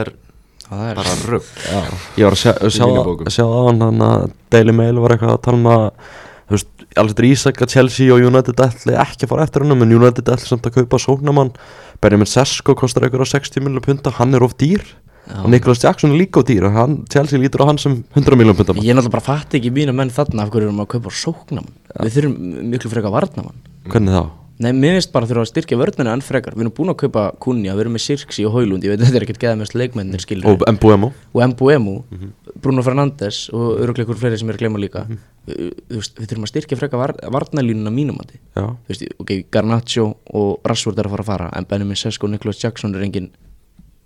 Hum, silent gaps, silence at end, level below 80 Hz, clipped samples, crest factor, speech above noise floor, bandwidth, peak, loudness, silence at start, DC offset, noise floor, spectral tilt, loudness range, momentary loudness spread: none; none; 0.8 s; -40 dBFS; 0.1%; 14 dB; 33 dB; 12.5 kHz; 0 dBFS; -15 LUFS; 0 s; under 0.1%; -47 dBFS; -6.5 dB/octave; 8 LU; 12 LU